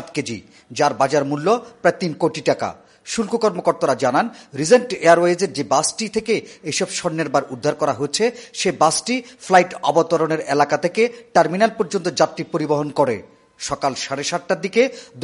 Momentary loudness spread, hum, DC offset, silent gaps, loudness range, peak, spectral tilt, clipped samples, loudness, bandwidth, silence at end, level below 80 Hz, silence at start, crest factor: 9 LU; none; under 0.1%; none; 3 LU; 0 dBFS; -4 dB/octave; under 0.1%; -19 LUFS; 11.5 kHz; 0 s; -60 dBFS; 0 s; 18 dB